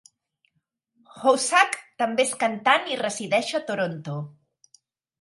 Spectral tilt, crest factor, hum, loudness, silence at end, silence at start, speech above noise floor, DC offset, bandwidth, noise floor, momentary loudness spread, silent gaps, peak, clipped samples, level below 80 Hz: -3 dB/octave; 22 dB; none; -23 LUFS; 0.9 s; 1.15 s; 52 dB; under 0.1%; 11.5 kHz; -75 dBFS; 12 LU; none; -2 dBFS; under 0.1%; -78 dBFS